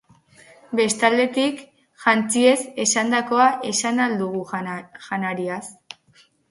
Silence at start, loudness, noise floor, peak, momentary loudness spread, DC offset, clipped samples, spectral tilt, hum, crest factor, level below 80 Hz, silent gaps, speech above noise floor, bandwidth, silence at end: 0.7 s; -21 LUFS; -57 dBFS; -2 dBFS; 16 LU; under 0.1%; under 0.1%; -3 dB/octave; none; 20 dB; -68 dBFS; none; 37 dB; 11.5 kHz; 0.8 s